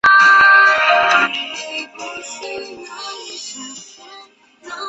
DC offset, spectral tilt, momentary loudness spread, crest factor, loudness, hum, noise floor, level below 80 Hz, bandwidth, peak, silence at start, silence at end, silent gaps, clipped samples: under 0.1%; -0.5 dB/octave; 23 LU; 14 dB; -11 LUFS; none; -44 dBFS; -58 dBFS; 8.2 kHz; -2 dBFS; 0.05 s; 0 s; none; under 0.1%